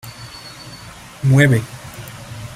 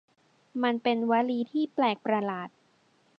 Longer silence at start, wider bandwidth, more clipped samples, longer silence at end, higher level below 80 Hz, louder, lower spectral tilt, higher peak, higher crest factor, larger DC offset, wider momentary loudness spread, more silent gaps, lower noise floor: second, 0.05 s vs 0.55 s; first, 15.5 kHz vs 5.6 kHz; neither; second, 0 s vs 0.7 s; first, -48 dBFS vs -84 dBFS; first, -15 LUFS vs -28 LUFS; about the same, -6.5 dB/octave vs -7.5 dB/octave; first, -2 dBFS vs -12 dBFS; about the same, 18 dB vs 18 dB; neither; first, 22 LU vs 12 LU; neither; second, -37 dBFS vs -66 dBFS